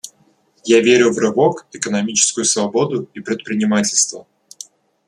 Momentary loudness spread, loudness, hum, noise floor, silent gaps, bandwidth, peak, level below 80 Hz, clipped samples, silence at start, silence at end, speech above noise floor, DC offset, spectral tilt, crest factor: 23 LU; -16 LUFS; none; -57 dBFS; none; 13 kHz; 0 dBFS; -62 dBFS; under 0.1%; 0.05 s; 0.85 s; 41 dB; under 0.1%; -3 dB/octave; 18 dB